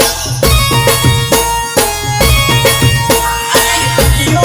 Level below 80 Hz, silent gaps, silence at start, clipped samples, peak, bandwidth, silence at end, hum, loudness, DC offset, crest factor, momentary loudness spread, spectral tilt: -20 dBFS; none; 0 s; 0.2%; 0 dBFS; over 20 kHz; 0 s; none; -10 LUFS; under 0.1%; 10 dB; 4 LU; -3.5 dB/octave